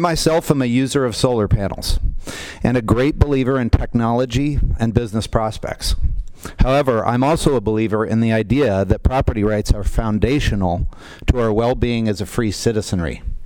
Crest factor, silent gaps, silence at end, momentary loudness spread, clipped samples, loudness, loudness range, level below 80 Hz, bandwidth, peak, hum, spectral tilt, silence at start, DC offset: 18 dB; none; 0 s; 8 LU; under 0.1%; -18 LUFS; 2 LU; -24 dBFS; 18 kHz; 0 dBFS; none; -6 dB/octave; 0 s; under 0.1%